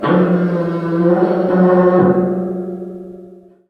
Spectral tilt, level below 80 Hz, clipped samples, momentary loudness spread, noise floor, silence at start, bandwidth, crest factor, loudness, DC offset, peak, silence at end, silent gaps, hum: -10.5 dB/octave; -54 dBFS; under 0.1%; 17 LU; -40 dBFS; 0 s; 4.9 kHz; 14 dB; -14 LUFS; under 0.1%; 0 dBFS; 0.35 s; none; none